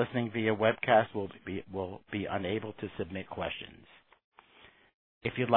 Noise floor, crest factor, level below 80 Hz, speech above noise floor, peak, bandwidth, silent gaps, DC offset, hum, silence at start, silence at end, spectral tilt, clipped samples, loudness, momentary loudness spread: -60 dBFS; 24 dB; -64 dBFS; 28 dB; -10 dBFS; 4.3 kHz; 4.24-4.32 s, 4.94-5.21 s; under 0.1%; none; 0 s; 0 s; -9.5 dB/octave; under 0.1%; -33 LUFS; 13 LU